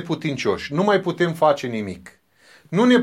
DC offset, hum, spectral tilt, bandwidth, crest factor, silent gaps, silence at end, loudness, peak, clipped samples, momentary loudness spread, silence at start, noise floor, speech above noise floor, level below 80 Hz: under 0.1%; none; -6 dB/octave; 13.5 kHz; 16 dB; none; 0 s; -21 LUFS; -4 dBFS; under 0.1%; 11 LU; 0 s; -53 dBFS; 33 dB; -58 dBFS